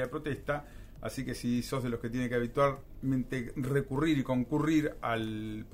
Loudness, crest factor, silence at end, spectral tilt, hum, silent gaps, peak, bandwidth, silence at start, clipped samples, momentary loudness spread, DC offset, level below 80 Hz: -33 LUFS; 16 dB; 0 s; -6.5 dB/octave; none; none; -16 dBFS; 16 kHz; 0 s; under 0.1%; 9 LU; under 0.1%; -50 dBFS